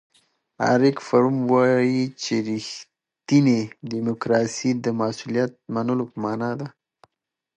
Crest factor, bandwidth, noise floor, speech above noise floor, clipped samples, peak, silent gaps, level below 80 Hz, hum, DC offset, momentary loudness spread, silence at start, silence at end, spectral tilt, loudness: 18 dB; 9.4 kHz; -78 dBFS; 56 dB; under 0.1%; -4 dBFS; none; -68 dBFS; none; under 0.1%; 11 LU; 0.6 s; 0.9 s; -6 dB/octave; -22 LUFS